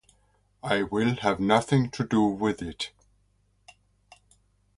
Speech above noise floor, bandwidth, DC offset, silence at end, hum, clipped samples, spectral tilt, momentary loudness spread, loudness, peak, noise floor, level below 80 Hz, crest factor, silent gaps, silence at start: 42 dB; 11.5 kHz; under 0.1%; 1.9 s; none; under 0.1%; -6 dB/octave; 12 LU; -26 LUFS; -6 dBFS; -67 dBFS; -56 dBFS; 22 dB; none; 0.65 s